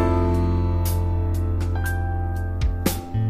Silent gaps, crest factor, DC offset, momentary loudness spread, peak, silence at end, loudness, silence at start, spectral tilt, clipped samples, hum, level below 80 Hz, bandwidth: none; 16 dB; under 0.1%; 5 LU; -6 dBFS; 0 s; -24 LUFS; 0 s; -6.5 dB/octave; under 0.1%; none; -28 dBFS; 15.5 kHz